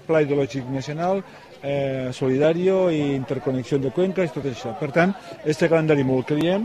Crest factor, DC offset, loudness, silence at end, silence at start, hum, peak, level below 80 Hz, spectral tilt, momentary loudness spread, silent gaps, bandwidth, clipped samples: 16 dB; under 0.1%; -22 LUFS; 0 s; 0.1 s; none; -6 dBFS; -56 dBFS; -7 dB/octave; 9 LU; none; 13 kHz; under 0.1%